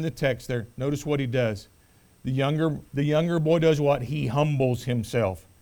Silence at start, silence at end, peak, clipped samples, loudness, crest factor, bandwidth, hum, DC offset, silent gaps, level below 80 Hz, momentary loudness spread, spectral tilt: 0 s; 0.2 s; -10 dBFS; under 0.1%; -25 LUFS; 16 dB; 19.5 kHz; none; under 0.1%; none; -50 dBFS; 8 LU; -7 dB/octave